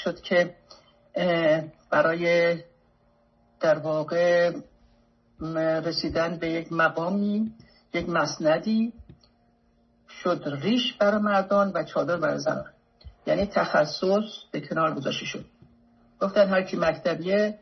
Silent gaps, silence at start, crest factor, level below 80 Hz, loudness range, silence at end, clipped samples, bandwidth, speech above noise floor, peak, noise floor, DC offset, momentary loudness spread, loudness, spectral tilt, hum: none; 0 s; 18 dB; -58 dBFS; 2 LU; 0.05 s; under 0.1%; 6.4 kHz; 39 dB; -8 dBFS; -64 dBFS; under 0.1%; 10 LU; -25 LUFS; -5.5 dB/octave; none